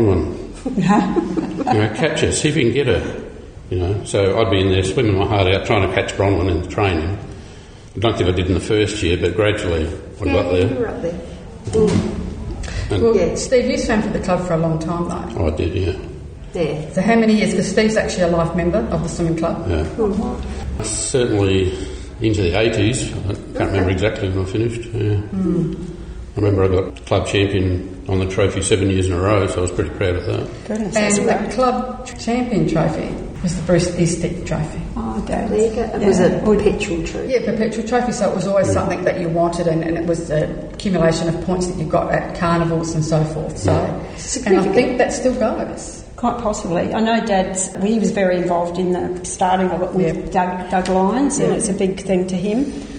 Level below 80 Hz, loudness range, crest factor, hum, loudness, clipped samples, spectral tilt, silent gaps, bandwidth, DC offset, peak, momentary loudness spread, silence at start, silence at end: -34 dBFS; 2 LU; 16 dB; none; -18 LUFS; under 0.1%; -5.5 dB/octave; none; 9.8 kHz; under 0.1%; 0 dBFS; 9 LU; 0 s; 0 s